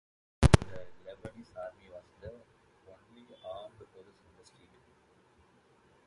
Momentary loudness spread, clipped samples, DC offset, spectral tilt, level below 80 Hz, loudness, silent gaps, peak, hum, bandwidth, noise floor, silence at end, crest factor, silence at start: 27 LU; under 0.1%; under 0.1%; -6 dB/octave; -42 dBFS; -31 LUFS; none; -2 dBFS; none; 11.5 kHz; -66 dBFS; 2.4 s; 34 dB; 0.4 s